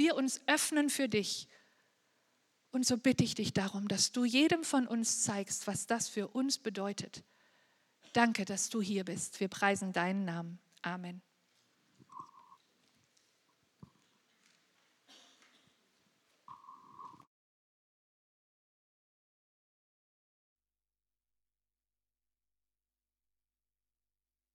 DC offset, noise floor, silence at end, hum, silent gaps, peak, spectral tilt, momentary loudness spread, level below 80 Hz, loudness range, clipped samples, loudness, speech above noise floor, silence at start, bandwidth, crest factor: under 0.1%; under -90 dBFS; 7.4 s; none; none; -12 dBFS; -3.5 dB/octave; 23 LU; -76 dBFS; 10 LU; under 0.1%; -33 LUFS; over 56 dB; 0 s; 16 kHz; 26 dB